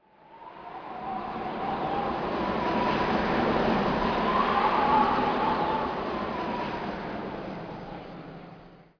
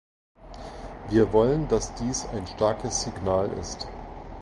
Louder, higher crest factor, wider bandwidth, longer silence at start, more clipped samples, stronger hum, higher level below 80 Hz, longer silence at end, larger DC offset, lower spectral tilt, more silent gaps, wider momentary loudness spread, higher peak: about the same, -28 LUFS vs -26 LUFS; about the same, 16 dB vs 20 dB; second, 5.4 kHz vs 11.5 kHz; about the same, 0.3 s vs 0.4 s; neither; neither; second, -48 dBFS vs -42 dBFS; first, 0.15 s vs 0 s; neither; first, -7 dB/octave vs -5 dB/octave; neither; about the same, 17 LU vs 19 LU; second, -12 dBFS vs -8 dBFS